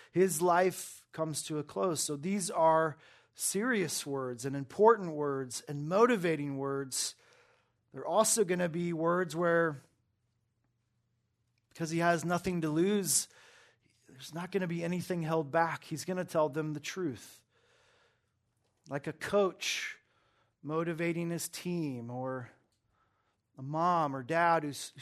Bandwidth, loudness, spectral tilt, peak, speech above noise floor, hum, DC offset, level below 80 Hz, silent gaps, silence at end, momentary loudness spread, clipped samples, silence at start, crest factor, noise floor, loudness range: 13.5 kHz; -32 LUFS; -4.5 dB/octave; -10 dBFS; 47 dB; none; under 0.1%; -74 dBFS; none; 0 s; 13 LU; under 0.1%; 0.15 s; 22 dB; -78 dBFS; 7 LU